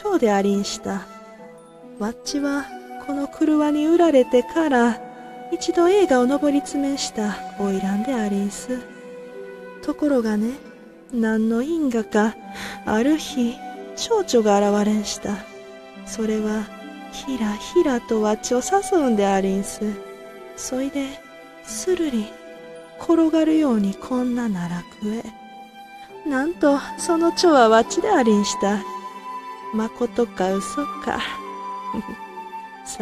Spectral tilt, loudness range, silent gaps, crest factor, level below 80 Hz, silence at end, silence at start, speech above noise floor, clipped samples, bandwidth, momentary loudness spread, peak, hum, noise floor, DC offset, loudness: -5 dB/octave; 7 LU; none; 18 dB; -52 dBFS; 0 s; 0 s; 22 dB; under 0.1%; 14 kHz; 20 LU; -2 dBFS; none; -43 dBFS; under 0.1%; -21 LUFS